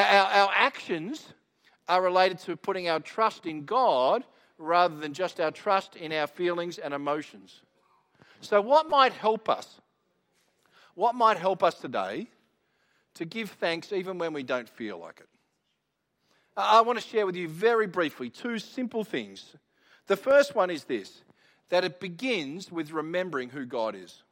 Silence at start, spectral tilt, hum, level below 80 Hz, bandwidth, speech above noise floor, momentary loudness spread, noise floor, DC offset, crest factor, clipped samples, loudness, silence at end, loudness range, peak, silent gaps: 0 s; -4.5 dB/octave; none; -80 dBFS; 16 kHz; 51 dB; 15 LU; -79 dBFS; under 0.1%; 22 dB; under 0.1%; -27 LUFS; 0.2 s; 6 LU; -6 dBFS; none